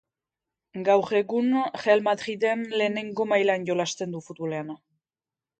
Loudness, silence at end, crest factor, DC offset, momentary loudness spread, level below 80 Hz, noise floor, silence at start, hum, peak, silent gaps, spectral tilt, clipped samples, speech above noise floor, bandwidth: -25 LUFS; 0.85 s; 20 dB; under 0.1%; 12 LU; -74 dBFS; under -90 dBFS; 0.75 s; none; -6 dBFS; none; -5 dB/octave; under 0.1%; over 65 dB; 9 kHz